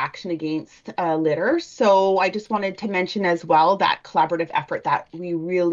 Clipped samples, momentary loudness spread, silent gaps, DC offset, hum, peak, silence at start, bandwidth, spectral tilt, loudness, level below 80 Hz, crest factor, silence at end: under 0.1%; 10 LU; none; under 0.1%; none; -6 dBFS; 0 s; 7.6 kHz; -5.5 dB/octave; -21 LUFS; -66 dBFS; 14 dB; 0 s